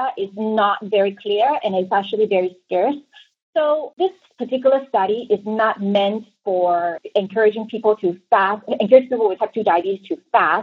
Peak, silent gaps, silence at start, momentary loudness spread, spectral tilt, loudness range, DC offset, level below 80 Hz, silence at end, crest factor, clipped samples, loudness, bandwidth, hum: 0 dBFS; 3.42-3.53 s; 0 s; 6 LU; -7.5 dB/octave; 3 LU; under 0.1%; -76 dBFS; 0 s; 18 dB; under 0.1%; -19 LUFS; 5.4 kHz; none